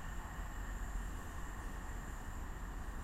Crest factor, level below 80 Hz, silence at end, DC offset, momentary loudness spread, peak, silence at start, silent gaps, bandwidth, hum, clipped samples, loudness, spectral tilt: 12 dB; -44 dBFS; 0 s; under 0.1%; 2 LU; -30 dBFS; 0 s; none; 16 kHz; none; under 0.1%; -47 LUFS; -5 dB/octave